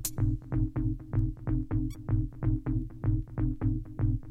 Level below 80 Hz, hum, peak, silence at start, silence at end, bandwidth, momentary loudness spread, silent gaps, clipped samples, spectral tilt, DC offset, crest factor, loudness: -36 dBFS; none; -16 dBFS; 0 s; 0 s; 16 kHz; 3 LU; none; under 0.1%; -7.5 dB/octave; under 0.1%; 14 dB; -32 LUFS